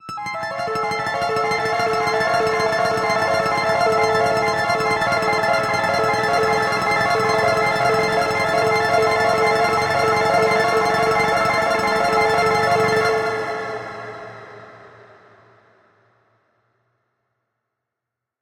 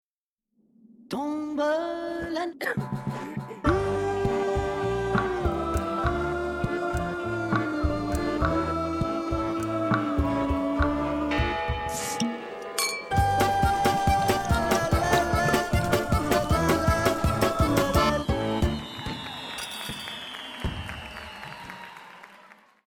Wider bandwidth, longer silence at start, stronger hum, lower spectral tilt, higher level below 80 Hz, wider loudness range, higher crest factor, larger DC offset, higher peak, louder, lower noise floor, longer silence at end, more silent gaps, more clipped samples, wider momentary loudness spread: second, 17 kHz vs 20 kHz; second, 0.05 s vs 1.1 s; neither; second, -4 dB/octave vs -5.5 dB/octave; second, -52 dBFS vs -38 dBFS; about the same, 5 LU vs 7 LU; about the same, 14 dB vs 18 dB; neither; about the same, -6 dBFS vs -8 dBFS; first, -18 LUFS vs -27 LUFS; second, -84 dBFS vs -89 dBFS; first, 3.55 s vs 0.4 s; neither; neither; second, 8 LU vs 11 LU